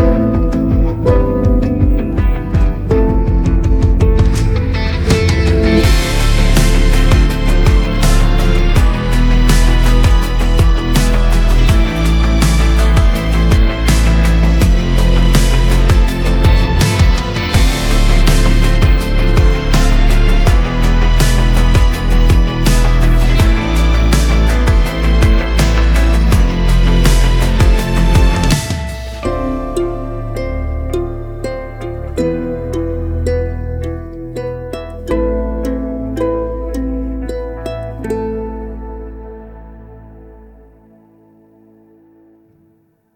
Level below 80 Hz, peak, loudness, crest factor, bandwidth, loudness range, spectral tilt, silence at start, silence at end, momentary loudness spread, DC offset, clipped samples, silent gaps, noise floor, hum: -12 dBFS; 0 dBFS; -14 LUFS; 12 dB; 15 kHz; 8 LU; -6 dB/octave; 0 s; 2.9 s; 10 LU; under 0.1%; under 0.1%; none; -55 dBFS; none